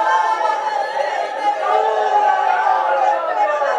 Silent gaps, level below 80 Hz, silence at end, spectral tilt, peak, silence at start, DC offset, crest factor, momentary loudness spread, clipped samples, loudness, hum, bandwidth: none; -88 dBFS; 0 s; -1 dB/octave; -4 dBFS; 0 s; under 0.1%; 14 dB; 5 LU; under 0.1%; -17 LUFS; none; 10.5 kHz